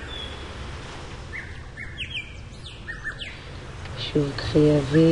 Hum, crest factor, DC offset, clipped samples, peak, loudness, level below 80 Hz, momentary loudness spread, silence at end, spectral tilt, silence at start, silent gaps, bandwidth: none; 18 dB; under 0.1%; under 0.1%; -8 dBFS; -27 LUFS; -42 dBFS; 19 LU; 0 s; -6.5 dB/octave; 0 s; none; 11 kHz